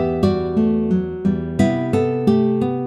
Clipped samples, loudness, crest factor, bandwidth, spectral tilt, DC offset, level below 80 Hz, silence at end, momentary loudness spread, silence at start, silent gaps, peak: under 0.1%; -19 LUFS; 14 dB; 10.5 kHz; -8.5 dB/octave; under 0.1%; -46 dBFS; 0 s; 4 LU; 0 s; none; -4 dBFS